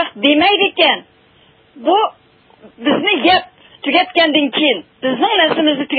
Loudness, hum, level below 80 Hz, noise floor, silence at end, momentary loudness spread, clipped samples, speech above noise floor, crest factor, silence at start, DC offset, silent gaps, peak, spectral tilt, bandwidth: -14 LUFS; none; -60 dBFS; -50 dBFS; 0 s; 10 LU; under 0.1%; 36 dB; 16 dB; 0 s; under 0.1%; none; 0 dBFS; -6.5 dB/octave; 5 kHz